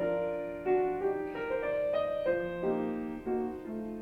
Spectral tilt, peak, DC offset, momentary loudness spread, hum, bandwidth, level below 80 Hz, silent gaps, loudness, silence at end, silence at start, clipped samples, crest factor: -8 dB/octave; -18 dBFS; under 0.1%; 6 LU; none; 5.2 kHz; -58 dBFS; none; -33 LUFS; 0 s; 0 s; under 0.1%; 14 dB